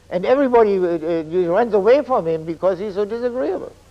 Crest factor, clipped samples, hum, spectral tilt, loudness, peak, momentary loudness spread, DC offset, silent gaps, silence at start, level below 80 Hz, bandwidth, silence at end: 14 dB; under 0.1%; none; -7.5 dB/octave; -18 LUFS; -4 dBFS; 9 LU; under 0.1%; none; 0.1 s; -52 dBFS; 8.4 kHz; 0.2 s